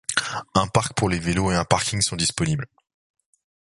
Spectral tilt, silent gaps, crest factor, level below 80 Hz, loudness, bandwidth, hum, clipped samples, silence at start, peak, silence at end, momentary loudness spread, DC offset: -4 dB/octave; none; 24 dB; -42 dBFS; -22 LUFS; 11.5 kHz; none; under 0.1%; 0.1 s; 0 dBFS; 1.1 s; 4 LU; under 0.1%